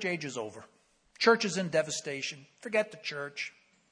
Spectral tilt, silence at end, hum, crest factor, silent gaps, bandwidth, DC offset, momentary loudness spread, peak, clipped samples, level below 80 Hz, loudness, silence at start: -3.5 dB/octave; 0.4 s; none; 22 dB; none; 10.5 kHz; under 0.1%; 15 LU; -12 dBFS; under 0.1%; -80 dBFS; -31 LUFS; 0 s